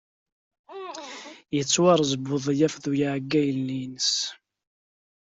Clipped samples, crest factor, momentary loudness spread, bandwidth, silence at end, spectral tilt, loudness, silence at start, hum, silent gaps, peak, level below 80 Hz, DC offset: under 0.1%; 20 dB; 18 LU; 8.2 kHz; 0.95 s; -4 dB/octave; -24 LUFS; 0.7 s; none; none; -6 dBFS; -66 dBFS; under 0.1%